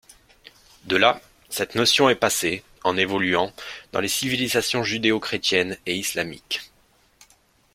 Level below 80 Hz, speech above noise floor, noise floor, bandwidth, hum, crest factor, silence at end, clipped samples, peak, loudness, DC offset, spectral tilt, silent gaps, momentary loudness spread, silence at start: -58 dBFS; 37 dB; -60 dBFS; 16.5 kHz; none; 22 dB; 1.1 s; under 0.1%; -2 dBFS; -22 LUFS; under 0.1%; -2.5 dB/octave; none; 11 LU; 0.85 s